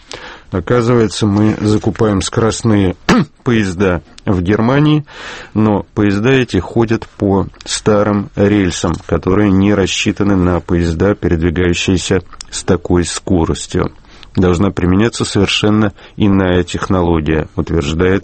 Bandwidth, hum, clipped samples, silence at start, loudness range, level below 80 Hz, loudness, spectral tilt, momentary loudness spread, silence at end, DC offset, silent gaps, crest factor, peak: 8.8 kHz; none; under 0.1%; 0.15 s; 2 LU; -32 dBFS; -14 LUFS; -6 dB/octave; 6 LU; 0 s; under 0.1%; none; 14 dB; 0 dBFS